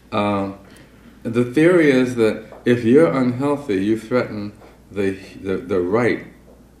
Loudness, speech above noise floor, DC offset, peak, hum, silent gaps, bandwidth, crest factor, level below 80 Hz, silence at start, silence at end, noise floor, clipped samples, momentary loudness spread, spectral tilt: -19 LUFS; 27 dB; under 0.1%; -2 dBFS; none; none; 13.5 kHz; 18 dB; -52 dBFS; 0.1 s; 0.5 s; -45 dBFS; under 0.1%; 14 LU; -7 dB/octave